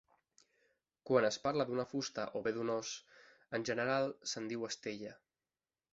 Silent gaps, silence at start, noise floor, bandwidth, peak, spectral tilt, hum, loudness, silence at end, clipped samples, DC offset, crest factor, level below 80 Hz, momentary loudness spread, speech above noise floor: none; 1.05 s; under -90 dBFS; 7.6 kHz; -18 dBFS; -3.5 dB/octave; none; -38 LUFS; 0.8 s; under 0.1%; under 0.1%; 22 dB; -78 dBFS; 12 LU; over 53 dB